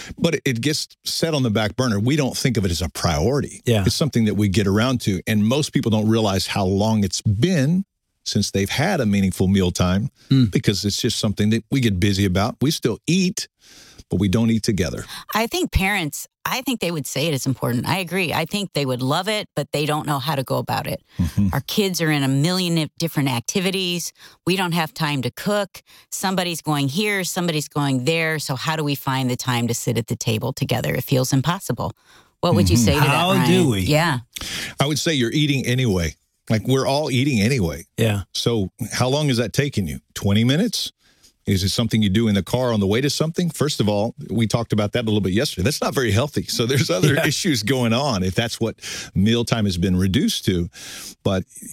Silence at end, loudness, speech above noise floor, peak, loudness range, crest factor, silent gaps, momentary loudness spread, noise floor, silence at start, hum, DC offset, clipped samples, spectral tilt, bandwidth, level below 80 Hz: 0 s; -21 LUFS; 36 dB; -2 dBFS; 3 LU; 18 dB; none; 6 LU; -56 dBFS; 0 s; none; under 0.1%; under 0.1%; -5 dB/octave; 17 kHz; -42 dBFS